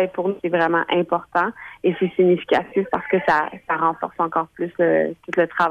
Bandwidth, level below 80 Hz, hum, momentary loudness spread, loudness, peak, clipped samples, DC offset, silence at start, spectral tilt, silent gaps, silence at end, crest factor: 7.2 kHz; -60 dBFS; none; 6 LU; -21 LUFS; -4 dBFS; under 0.1%; under 0.1%; 0 s; -7.5 dB/octave; none; 0 s; 16 dB